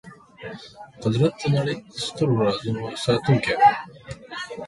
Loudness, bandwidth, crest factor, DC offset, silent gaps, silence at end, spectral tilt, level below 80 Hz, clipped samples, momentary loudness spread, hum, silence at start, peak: -22 LUFS; 11.5 kHz; 18 dB; under 0.1%; none; 0 s; -6 dB/octave; -54 dBFS; under 0.1%; 21 LU; none; 0.05 s; -4 dBFS